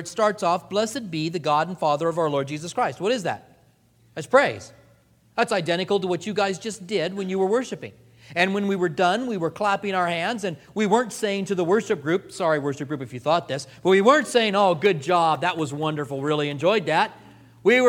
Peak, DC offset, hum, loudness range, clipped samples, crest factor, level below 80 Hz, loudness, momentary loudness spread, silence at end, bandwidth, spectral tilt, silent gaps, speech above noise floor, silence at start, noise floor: -2 dBFS; under 0.1%; none; 4 LU; under 0.1%; 20 dB; -66 dBFS; -23 LUFS; 9 LU; 0 s; 16.5 kHz; -5 dB/octave; none; 36 dB; 0 s; -59 dBFS